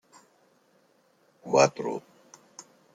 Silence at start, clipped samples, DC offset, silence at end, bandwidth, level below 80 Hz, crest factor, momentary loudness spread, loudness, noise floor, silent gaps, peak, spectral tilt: 1.45 s; under 0.1%; under 0.1%; 0.35 s; 9.6 kHz; -78 dBFS; 24 dB; 26 LU; -26 LUFS; -65 dBFS; none; -6 dBFS; -4 dB/octave